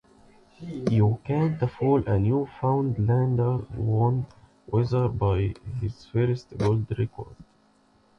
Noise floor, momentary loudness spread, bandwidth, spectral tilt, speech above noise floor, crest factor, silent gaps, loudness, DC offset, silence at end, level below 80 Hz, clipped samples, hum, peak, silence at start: -62 dBFS; 10 LU; 6.6 kHz; -9.5 dB/octave; 37 dB; 16 dB; none; -26 LUFS; under 0.1%; 0.75 s; -46 dBFS; under 0.1%; none; -10 dBFS; 0.6 s